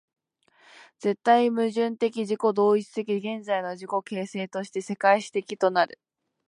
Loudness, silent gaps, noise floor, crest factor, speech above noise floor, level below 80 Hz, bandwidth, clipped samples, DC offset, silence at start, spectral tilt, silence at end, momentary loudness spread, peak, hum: -26 LUFS; none; -63 dBFS; 20 dB; 38 dB; -80 dBFS; 11 kHz; under 0.1%; under 0.1%; 1 s; -5.5 dB/octave; 0.6 s; 11 LU; -6 dBFS; none